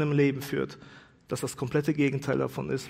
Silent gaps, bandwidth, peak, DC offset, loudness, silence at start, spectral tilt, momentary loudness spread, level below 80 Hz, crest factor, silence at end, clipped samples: none; 16 kHz; -12 dBFS; under 0.1%; -29 LUFS; 0 s; -6.5 dB/octave; 11 LU; -62 dBFS; 16 dB; 0 s; under 0.1%